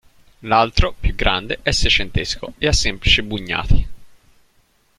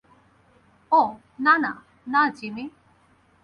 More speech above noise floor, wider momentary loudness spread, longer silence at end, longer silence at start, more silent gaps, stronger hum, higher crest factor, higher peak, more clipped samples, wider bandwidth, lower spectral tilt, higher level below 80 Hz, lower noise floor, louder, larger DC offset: first, 42 dB vs 38 dB; second, 8 LU vs 17 LU; first, 0.9 s vs 0.75 s; second, 0.45 s vs 0.9 s; neither; neither; about the same, 18 dB vs 20 dB; first, 0 dBFS vs -6 dBFS; neither; first, 11.5 kHz vs 10 kHz; second, -3.5 dB/octave vs -5.5 dB/octave; first, -24 dBFS vs -68 dBFS; about the same, -59 dBFS vs -60 dBFS; first, -18 LUFS vs -22 LUFS; neither